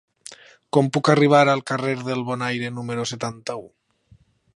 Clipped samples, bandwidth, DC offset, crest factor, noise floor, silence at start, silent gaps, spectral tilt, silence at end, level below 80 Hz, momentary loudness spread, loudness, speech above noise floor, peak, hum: under 0.1%; 11.5 kHz; under 0.1%; 20 dB; -56 dBFS; 0.3 s; none; -5.5 dB/octave; 0.9 s; -64 dBFS; 19 LU; -21 LUFS; 36 dB; -2 dBFS; none